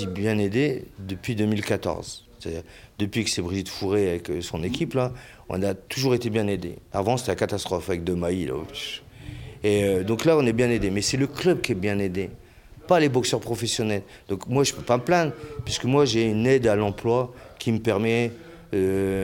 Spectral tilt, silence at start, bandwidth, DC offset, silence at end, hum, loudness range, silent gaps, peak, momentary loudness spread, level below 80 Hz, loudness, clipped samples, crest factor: -5 dB/octave; 0 s; 17 kHz; under 0.1%; 0 s; none; 5 LU; none; -6 dBFS; 13 LU; -48 dBFS; -25 LUFS; under 0.1%; 20 dB